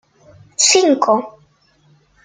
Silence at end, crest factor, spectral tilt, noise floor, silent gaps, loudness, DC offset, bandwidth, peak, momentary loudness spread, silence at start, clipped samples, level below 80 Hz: 0.95 s; 18 dB; -1 dB/octave; -55 dBFS; none; -13 LUFS; under 0.1%; 9.6 kHz; 0 dBFS; 19 LU; 0.6 s; under 0.1%; -64 dBFS